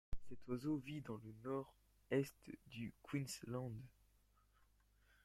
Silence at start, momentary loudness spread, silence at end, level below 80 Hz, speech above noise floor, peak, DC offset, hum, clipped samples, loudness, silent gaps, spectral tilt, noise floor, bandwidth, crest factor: 0.1 s; 14 LU; 1.35 s; -62 dBFS; 29 dB; -26 dBFS; under 0.1%; 50 Hz at -75 dBFS; under 0.1%; -47 LUFS; none; -6 dB/octave; -75 dBFS; 16 kHz; 20 dB